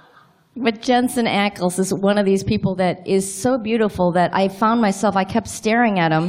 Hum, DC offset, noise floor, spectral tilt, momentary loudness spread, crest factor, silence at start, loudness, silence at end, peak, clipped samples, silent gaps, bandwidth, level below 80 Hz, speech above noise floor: none; under 0.1%; -52 dBFS; -5 dB/octave; 4 LU; 16 dB; 0.55 s; -19 LUFS; 0 s; -4 dBFS; under 0.1%; none; 16 kHz; -50 dBFS; 34 dB